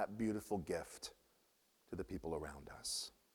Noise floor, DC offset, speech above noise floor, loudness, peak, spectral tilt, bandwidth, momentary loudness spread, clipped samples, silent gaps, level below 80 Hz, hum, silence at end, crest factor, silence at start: -76 dBFS; under 0.1%; 32 dB; -45 LUFS; -26 dBFS; -4 dB/octave; over 20 kHz; 11 LU; under 0.1%; none; -64 dBFS; none; 0.25 s; 18 dB; 0 s